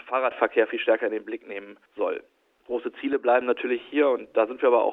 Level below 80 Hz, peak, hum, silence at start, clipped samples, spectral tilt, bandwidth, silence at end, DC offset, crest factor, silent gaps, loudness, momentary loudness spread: -74 dBFS; -6 dBFS; none; 0.05 s; under 0.1%; -6.5 dB/octave; 4 kHz; 0 s; under 0.1%; 18 dB; none; -25 LUFS; 13 LU